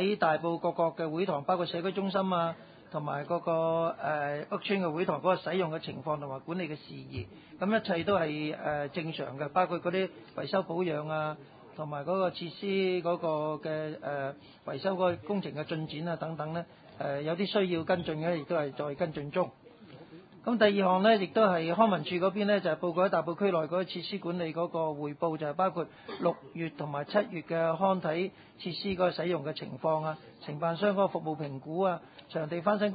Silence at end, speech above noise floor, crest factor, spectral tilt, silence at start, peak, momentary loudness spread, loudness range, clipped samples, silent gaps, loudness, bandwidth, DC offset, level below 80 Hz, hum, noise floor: 0 s; 21 dB; 20 dB; -4.5 dB/octave; 0 s; -10 dBFS; 11 LU; 5 LU; under 0.1%; none; -31 LUFS; 4.9 kHz; under 0.1%; -68 dBFS; none; -52 dBFS